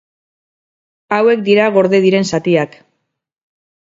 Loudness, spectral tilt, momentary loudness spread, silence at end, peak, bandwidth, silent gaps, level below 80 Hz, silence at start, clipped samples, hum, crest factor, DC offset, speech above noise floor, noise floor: -13 LUFS; -6 dB/octave; 6 LU; 1.2 s; 0 dBFS; 7.8 kHz; none; -60 dBFS; 1.1 s; under 0.1%; none; 16 dB; under 0.1%; 61 dB; -73 dBFS